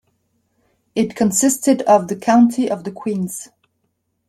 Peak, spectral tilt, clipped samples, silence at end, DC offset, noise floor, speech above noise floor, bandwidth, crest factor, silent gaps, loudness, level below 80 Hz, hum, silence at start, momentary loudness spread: -2 dBFS; -5 dB/octave; under 0.1%; 0.85 s; under 0.1%; -70 dBFS; 54 dB; 15.5 kHz; 16 dB; none; -17 LUFS; -62 dBFS; none; 0.95 s; 11 LU